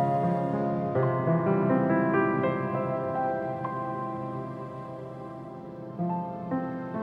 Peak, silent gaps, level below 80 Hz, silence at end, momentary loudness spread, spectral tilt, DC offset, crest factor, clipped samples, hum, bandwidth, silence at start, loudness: -12 dBFS; none; -64 dBFS; 0 s; 15 LU; -10.5 dB/octave; under 0.1%; 16 dB; under 0.1%; none; 5.4 kHz; 0 s; -28 LUFS